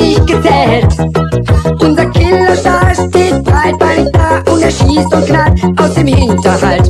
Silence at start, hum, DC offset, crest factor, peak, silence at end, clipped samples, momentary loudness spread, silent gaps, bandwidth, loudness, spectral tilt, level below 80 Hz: 0 s; none; under 0.1%; 8 dB; 0 dBFS; 0 s; 0.9%; 2 LU; none; 13 kHz; -9 LUFS; -6.5 dB/octave; -18 dBFS